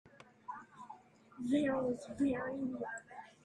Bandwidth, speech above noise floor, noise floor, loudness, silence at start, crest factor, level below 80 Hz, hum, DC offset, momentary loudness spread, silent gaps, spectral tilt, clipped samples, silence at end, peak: 11 kHz; 21 dB; -57 dBFS; -37 LUFS; 0.05 s; 16 dB; -72 dBFS; none; under 0.1%; 20 LU; none; -6 dB/octave; under 0.1%; 0.15 s; -22 dBFS